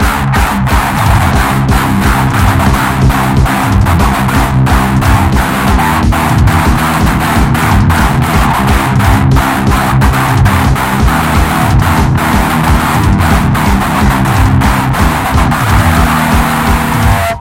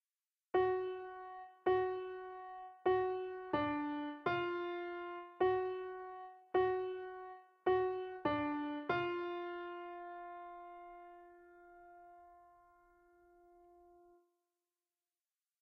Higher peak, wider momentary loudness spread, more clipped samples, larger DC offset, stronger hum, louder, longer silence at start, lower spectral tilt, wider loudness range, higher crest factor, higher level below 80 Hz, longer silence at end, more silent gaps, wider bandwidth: first, 0 dBFS vs -22 dBFS; second, 2 LU vs 19 LU; first, 0.2% vs under 0.1%; neither; neither; first, -9 LUFS vs -39 LUFS; second, 0 s vs 0.55 s; first, -5.5 dB/octave vs -4 dB/octave; second, 0 LU vs 15 LU; second, 8 dB vs 18 dB; first, -16 dBFS vs -72 dBFS; second, 0 s vs 3.2 s; neither; first, 17 kHz vs 5.4 kHz